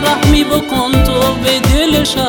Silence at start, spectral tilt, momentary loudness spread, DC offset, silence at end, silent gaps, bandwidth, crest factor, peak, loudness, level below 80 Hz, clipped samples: 0 s; -4.5 dB/octave; 3 LU; under 0.1%; 0 s; none; over 20 kHz; 12 dB; 0 dBFS; -12 LUFS; -20 dBFS; under 0.1%